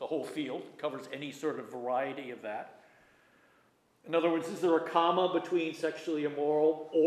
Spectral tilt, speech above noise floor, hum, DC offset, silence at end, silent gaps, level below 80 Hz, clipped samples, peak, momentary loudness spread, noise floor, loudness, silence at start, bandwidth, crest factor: -5.5 dB/octave; 37 dB; none; under 0.1%; 0 s; none; -88 dBFS; under 0.1%; -14 dBFS; 12 LU; -68 dBFS; -32 LUFS; 0 s; 13.5 kHz; 20 dB